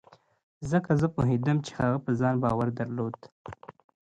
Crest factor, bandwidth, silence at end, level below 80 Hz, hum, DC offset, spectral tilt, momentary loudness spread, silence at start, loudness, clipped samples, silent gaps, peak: 18 dB; 9 kHz; 0.35 s; -54 dBFS; none; under 0.1%; -8 dB/octave; 20 LU; 0.6 s; -28 LUFS; under 0.1%; 3.32-3.45 s; -10 dBFS